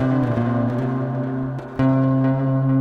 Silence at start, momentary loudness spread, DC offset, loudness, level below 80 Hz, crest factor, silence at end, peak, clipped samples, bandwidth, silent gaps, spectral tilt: 0 s; 7 LU; under 0.1%; -21 LUFS; -48 dBFS; 12 dB; 0 s; -8 dBFS; under 0.1%; 4.7 kHz; none; -10.5 dB/octave